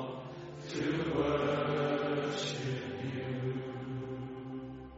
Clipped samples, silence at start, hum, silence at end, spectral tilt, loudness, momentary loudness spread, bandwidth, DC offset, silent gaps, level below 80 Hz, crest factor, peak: under 0.1%; 0 s; none; 0 s; -5 dB/octave; -36 LUFS; 12 LU; 8 kHz; under 0.1%; none; -60 dBFS; 16 dB; -20 dBFS